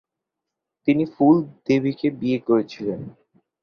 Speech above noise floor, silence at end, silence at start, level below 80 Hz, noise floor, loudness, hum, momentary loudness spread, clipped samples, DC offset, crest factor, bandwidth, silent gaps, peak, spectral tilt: 63 dB; 0.5 s; 0.85 s; -62 dBFS; -84 dBFS; -21 LUFS; none; 12 LU; under 0.1%; under 0.1%; 18 dB; 6.6 kHz; none; -6 dBFS; -8 dB/octave